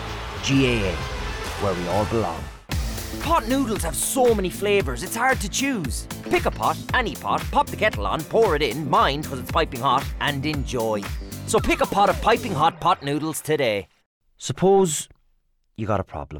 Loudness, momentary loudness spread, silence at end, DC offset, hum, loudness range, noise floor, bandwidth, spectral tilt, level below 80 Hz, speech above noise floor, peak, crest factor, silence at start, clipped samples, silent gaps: -23 LUFS; 10 LU; 0 s; under 0.1%; none; 2 LU; -64 dBFS; over 20 kHz; -4.5 dB/octave; -36 dBFS; 42 dB; -10 dBFS; 14 dB; 0 s; under 0.1%; 14.06-14.21 s